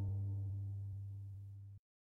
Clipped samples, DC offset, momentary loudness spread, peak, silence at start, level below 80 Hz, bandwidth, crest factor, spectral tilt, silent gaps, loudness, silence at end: under 0.1%; under 0.1%; 15 LU; -34 dBFS; 0 s; -66 dBFS; 1 kHz; 10 dB; -11 dB/octave; none; -46 LUFS; 0.35 s